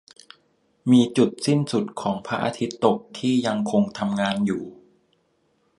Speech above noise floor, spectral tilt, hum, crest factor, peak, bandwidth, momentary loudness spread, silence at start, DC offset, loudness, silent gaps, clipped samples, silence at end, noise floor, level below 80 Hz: 45 dB; -6 dB/octave; none; 20 dB; -4 dBFS; 11.5 kHz; 9 LU; 0.85 s; under 0.1%; -23 LUFS; none; under 0.1%; 1.05 s; -67 dBFS; -64 dBFS